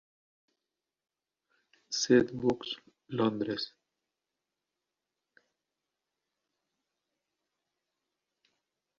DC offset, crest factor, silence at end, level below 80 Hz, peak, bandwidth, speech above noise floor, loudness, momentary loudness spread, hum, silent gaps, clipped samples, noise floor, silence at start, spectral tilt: under 0.1%; 26 dB; 5.3 s; -72 dBFS; -10 dBFS; 7.2 kHz; 60 dB; -31 LUFS; 15 LU; none; none; under 0.1%; -89 dBFS; 1.9 s; -4 dB/octave